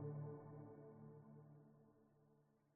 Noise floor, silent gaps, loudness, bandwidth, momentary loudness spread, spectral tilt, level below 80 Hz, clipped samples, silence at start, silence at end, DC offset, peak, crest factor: -77 dBFS; none; -58 LUFS; 2.4 kHz; 13 LU; -9.5 dB/octave; -84 dBFS; under 0.1%; 0 s; 0.05 s; under 0.1%; -40 dBFS; 18 dB